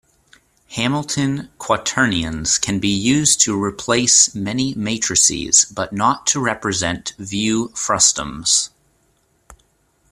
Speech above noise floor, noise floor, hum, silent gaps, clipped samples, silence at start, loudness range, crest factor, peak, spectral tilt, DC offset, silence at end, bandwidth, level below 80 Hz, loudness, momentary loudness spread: 43 dB; -62 dBFS; none; none; under 0.1%; 0.7 s; 4 LU; 20 dB; 0 dBFS; -2 dB/octave; under 0.1%; 0.55 s; 15 kHz; -46 dBFS; -16 LUFS; 9 LU